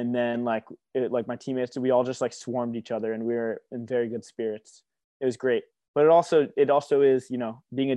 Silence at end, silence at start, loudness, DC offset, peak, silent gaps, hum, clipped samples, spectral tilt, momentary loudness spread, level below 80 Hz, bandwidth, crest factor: 0 s; 0 s; -26 LUFS; under 0.1%; -8 dBFS; 5.04-5.20 s, 5.88-5.94 s; none; under 0.1%; -6 dB/octave; 12 LU; -78 dBFS; 10 kHz; 18 dB